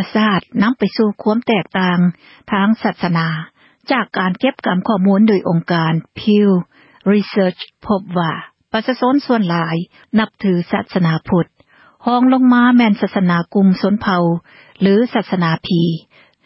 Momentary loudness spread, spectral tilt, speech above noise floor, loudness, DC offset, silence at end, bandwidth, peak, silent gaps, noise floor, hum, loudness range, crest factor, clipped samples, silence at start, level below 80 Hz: 9 LU; -11 dB/octave; 35 dB; -16 LUFS; under 0.1%; 0.45 s; 5.8 kHz; -2 dBFS; none; -50 dBFS; none; 4 LU; 12 dB; under 0.1%; 0 s; -52 dBFS